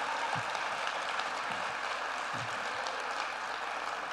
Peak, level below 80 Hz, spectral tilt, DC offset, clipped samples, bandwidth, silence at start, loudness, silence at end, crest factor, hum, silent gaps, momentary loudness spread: -16 dBFS; -70 dBFS; -2 dB/octave; under 0.1%; under 0.1%; 15 kHz; 0 s; -35 LUFS; 0 s; 20 dB; none; none; 3 LU